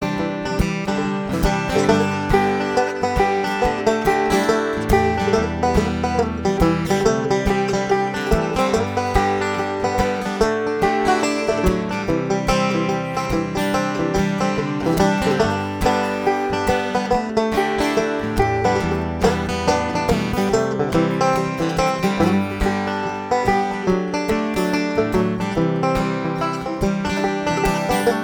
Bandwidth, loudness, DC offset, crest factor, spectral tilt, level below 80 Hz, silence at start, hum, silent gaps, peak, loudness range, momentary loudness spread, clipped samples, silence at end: over 20 kHz; -20 LUFS; under 0.1%; 16 dB; -5.5 dB/octave; -34 dBFS; 0 s; none; none; -2 dBFS; 2 LU; 4 LU; under 0.1%; 0 s